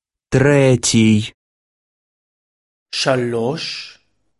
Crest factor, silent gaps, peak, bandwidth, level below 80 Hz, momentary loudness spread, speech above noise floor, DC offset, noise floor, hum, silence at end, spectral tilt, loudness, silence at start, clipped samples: 18 dB; 1.34-2.86 s; 0 dBFS; 11.5 kHz; -48 dBFS; 15 LU; over 75 dB; under 0.1%; under -90 dBFS; none; 0.5 s; -5 dB/octave; -16 LUFS; 0.3 s; under 0.1%